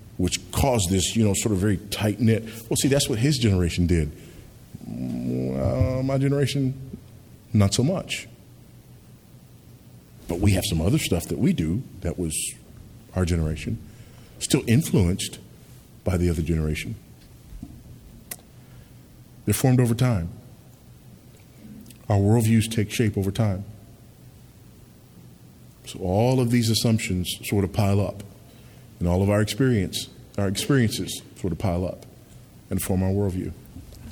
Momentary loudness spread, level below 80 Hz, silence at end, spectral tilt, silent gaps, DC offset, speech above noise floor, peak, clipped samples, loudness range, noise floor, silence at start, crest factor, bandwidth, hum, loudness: 21 LU; -42 dBFS; 0 s; -5.5 dB/octave; none; under 0.1%; 26 dB; -6 dBFS; under 0.1%; 5 LU; -49 dBFS; 0 s; 20 dB; 19.5 kHz; none; -24 LUFS